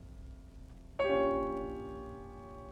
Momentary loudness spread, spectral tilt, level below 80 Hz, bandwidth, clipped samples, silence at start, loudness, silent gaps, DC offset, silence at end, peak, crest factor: 22 LU; -7 dB/octave; -52 dBFS; 9.8 kHz; under 0.1%; 0 s; -35 LUFS; none; under 0.1%; 0 s; -20 dBFS; 18 dB